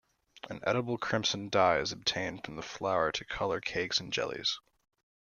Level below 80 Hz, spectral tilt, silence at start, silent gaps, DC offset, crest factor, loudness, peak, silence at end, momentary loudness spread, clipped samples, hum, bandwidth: -62 dBFS; -3.5 dB/octave; 0.45 s; none; under 0.1%; 20 dB; -32 LUFS; -12 dBFS; 0.7 s; 12 LU; under 0.1%; none; 11 kHz